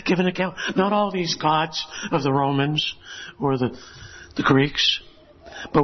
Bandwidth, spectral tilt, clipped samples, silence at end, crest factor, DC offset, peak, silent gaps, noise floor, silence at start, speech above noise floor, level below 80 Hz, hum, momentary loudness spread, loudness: 6.4 kHz; -5 dB/octave; under 0.1%; 0 s; 18 dB; under 0.1%; -4 dBFS; none; -43 dBFS; 0 s; 21 dB; -50 dBFS; none; 18 LU; -22 LUFS